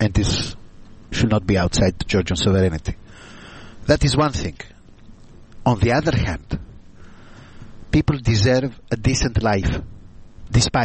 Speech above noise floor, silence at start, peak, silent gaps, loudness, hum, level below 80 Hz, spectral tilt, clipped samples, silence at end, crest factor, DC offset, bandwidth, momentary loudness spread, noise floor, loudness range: 24 dB; 0 s; -2 dBFS; none; -20 LUFS; none; -32 dBFS; -5.5 dB/octave; under 0.1%; 0 s; 18 dB; under 0.1%; 8.8 kHz; 14 LU; -43 dBFS; 3 LU